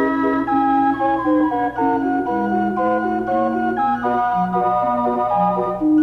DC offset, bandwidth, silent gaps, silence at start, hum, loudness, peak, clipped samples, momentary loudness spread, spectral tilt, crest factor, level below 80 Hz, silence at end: under 0.1%; 6.2 kHz; none; 0 s; none; -19 LUFS; -6 dBFS; under 0.1%; 3 LU; -8.5 dB/octave; 12 dB; -48 dBFS; 0 s